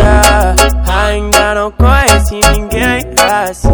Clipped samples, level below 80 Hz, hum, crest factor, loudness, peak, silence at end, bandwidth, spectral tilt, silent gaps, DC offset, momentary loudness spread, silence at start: 1%; -14 dBFS; none; 8 dB; -10 LUFS; 0 dBFS; 0 s; over 20 kHz; -4 dB/octave; none; under 0.1%; 5 LU; 0 s